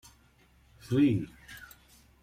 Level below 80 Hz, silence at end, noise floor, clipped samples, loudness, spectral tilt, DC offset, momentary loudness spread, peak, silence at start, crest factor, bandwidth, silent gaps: -60 dBFS; 0.6 s; -63 dBFS; under 0.1%; -28 LUFS; -7.5 dB/octave; under 0.1%; 22 LU; -16 dBFS; 0.9 s; 18 dB; 15.5 kHz; none